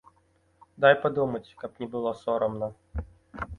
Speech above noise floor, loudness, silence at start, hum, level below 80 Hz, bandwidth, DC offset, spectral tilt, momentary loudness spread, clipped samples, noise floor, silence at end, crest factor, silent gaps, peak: 39 dB; -27 LUFS; 0.8 s; none; -48 dBFS; 6.8 kHz; under 0.1%; -7 dB/octave; 18 LU; under 0.1%; -66 dBFS; 0 s; 22 dB; none; -6 dBFS